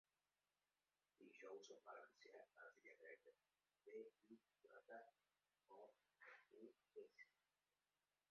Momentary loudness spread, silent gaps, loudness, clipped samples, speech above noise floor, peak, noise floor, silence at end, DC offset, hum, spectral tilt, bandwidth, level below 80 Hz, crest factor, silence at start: 7 LU; none; -65 LUFS; under 0.1%; over 25 dB; -48 dBFS; under -90 dBFS; 1 s; under 0.1%; 50 Hz at -105 dBFS; -1.5 dB/octave; 6.6 kHz; under -90 dBFS; 20 dB; 1.2 s